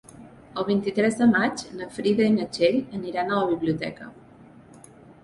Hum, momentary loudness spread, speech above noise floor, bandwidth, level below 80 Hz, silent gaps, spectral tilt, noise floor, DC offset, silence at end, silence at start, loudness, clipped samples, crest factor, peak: none; 14 LU; 26 dB; 11.5 kHz; -60 dBFS; none; -5.5 dB/octave; -49 dBFS; under 0.1%; 0.1 s; 0.2 s; -24 LUFS; under 0.1%; 18 dB; -8 dBFS